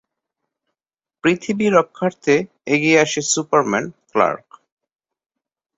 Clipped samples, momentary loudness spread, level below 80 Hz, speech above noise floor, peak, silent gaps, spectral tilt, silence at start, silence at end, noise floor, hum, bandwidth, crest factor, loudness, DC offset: under 0.1%; 8 LU; -62 dBFS; 72 dB; -2 dBFS; none; -4 dB/octave; 1.25 s; 1.4 s; -90 dBFS; none; 8.2 kHz; 18 dB; -18 LUFS; under 0.1%